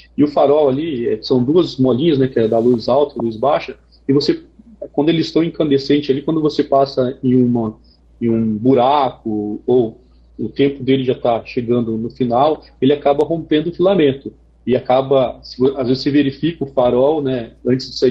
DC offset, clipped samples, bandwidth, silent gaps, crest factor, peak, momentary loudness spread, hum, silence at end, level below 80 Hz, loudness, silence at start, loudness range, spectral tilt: under 0.1%; under 0.1%; 7.8 kHz; none; 12 dB; -4 dBFS; 8 LU; none; 0 s; -48 dBFS; -16 LUFS; 0.2 s; 2 LU; -8 dB/octave